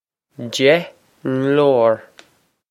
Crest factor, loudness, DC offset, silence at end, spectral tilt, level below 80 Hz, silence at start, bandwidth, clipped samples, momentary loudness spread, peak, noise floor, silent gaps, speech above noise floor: 18 dB; -17 LUFS; under 0.1%; 0.7 s; -5.5 dB/octave; -68 dBFS; 0.4 s; 15 kHz; under 0.1%; 16 LU; 0 dBFS; -57 dBFS; none; 41 dB